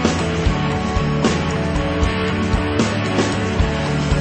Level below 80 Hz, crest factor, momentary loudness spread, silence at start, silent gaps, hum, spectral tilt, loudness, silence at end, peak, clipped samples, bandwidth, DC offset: -26 dBFS; 16 dB; 2 LU; 0 s; none; none; -5.5 dB/octave; -19 LUFS; 0 s; -2 dBFS; under 0.1%; 8.8 kHz; under 0.1%